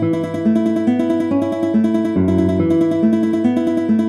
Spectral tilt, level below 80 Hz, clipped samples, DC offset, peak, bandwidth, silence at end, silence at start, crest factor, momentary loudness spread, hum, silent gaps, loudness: -8.5 dB/octave; -50 dBFS; under 0.1%; under 0.1%; -4 dBFS; 11.5 kHz; 0 s; 0 s; 12 dB; 2 LU; none; none; -16 LUFS